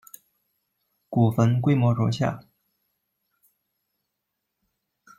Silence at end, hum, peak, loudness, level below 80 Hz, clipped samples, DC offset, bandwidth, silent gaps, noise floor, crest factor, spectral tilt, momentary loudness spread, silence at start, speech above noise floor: 2.8 s; none; -10 dBFS; -23 LUFS; -62 dBFS; under 0.1%; under 0.1%; 15.5 kHz; none; -81 dBFS; 18 dB; -8 dB/octave; 8 LU; 1.1 s; 60 dB